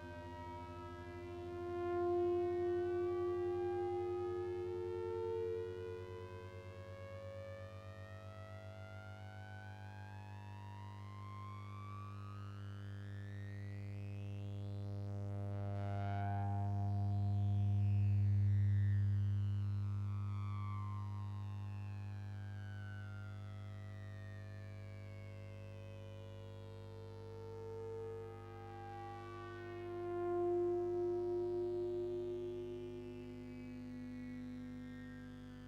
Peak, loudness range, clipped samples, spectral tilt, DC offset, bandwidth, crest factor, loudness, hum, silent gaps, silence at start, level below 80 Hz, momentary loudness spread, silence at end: -30 dBFS; 15 LU; under 0.1%; -9.5 dB/octave; under 0.1%; 6.2 kHz; 12 dB; -43 LUFS; 50 Hz at -45 dBFS; none; 0 s; -66 dBFS; 15 LU; 0 s